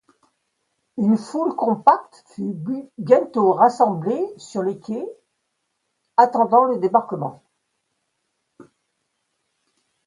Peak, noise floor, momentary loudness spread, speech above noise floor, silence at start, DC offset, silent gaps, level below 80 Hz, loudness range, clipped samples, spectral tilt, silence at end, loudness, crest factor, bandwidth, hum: 0 dBFS; -75 dBFS; 14 LU; 55 dB; 0.95 s; under 0.1%; none; -72 dBFS; 4 LU; under 0.1%; -7.5 dB/octave; 2.7 s; -20 LUFS; 22 dB; 11 kHz; none